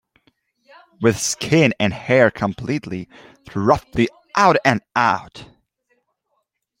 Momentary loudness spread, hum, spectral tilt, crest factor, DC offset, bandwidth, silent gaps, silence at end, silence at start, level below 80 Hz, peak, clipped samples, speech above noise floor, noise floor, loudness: 13 LU; none; -5 dB/octave; 18 dB; under 0.1%; 16.5 kHz; none; 1.35 s; 1 s; -50 dBFS; -2 dBFS; under 0.1%; 54 dB; -72 dBFS; -18 LUFS